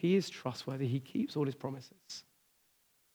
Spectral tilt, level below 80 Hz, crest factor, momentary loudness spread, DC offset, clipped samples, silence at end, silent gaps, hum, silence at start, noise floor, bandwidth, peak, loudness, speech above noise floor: -6.5 dB/octave; -86 dBFS; 18 dB; 15 LU; under 0.1%; under 0.1%; 0.95 s; none; none; 0 s; -72 dBFS; over 20 kHz; -20 dBFS; -37 LUFS; 37 dB